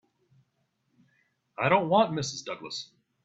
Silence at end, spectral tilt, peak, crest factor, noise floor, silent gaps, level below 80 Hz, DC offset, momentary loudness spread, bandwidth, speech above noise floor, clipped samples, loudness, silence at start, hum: 0.4 s; -4.5 dB/octave; -8 dBFS; 22 dB; -75 dBFS; none; -68 dBFS; under 0.1%; 19 LU; 8.2 kHz; 49 dB; under 0.1%; -27 LUFS; 1.6 s; none